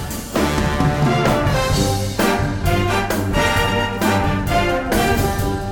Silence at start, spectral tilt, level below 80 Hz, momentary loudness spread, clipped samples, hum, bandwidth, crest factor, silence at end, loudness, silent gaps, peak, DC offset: 0 s; -5 dB/octave; -28 dBFS; 3 LU; under 0.1%; none; 19 kHz; 14 dB; 0 s; -18 LUFS; none; -4 dBFS; 0.7%